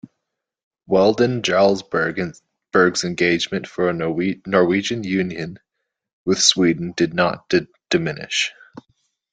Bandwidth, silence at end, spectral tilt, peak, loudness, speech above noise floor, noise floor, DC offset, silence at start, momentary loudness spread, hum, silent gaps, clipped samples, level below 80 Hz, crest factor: 9.4 kHz; 0.5 s; -4 dB/octave; 0 dBFS; -19 LUFS; 61 dB; -80 dBFS; under 0.1%; 0.9 s; 9 LU; none; 6.13-6.26 s; under 0.1%; -58 dBFS; 20 dB